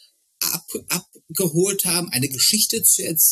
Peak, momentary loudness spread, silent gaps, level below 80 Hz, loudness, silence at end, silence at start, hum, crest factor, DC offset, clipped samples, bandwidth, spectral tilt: -4 dBFS; 11 LU; none; -64 dBFS; -19 LUFS; 0 s; 0.4 s; none; 18 dB; under 0.1%; under 0.1%; 14.5 kHz; -2 dB/octave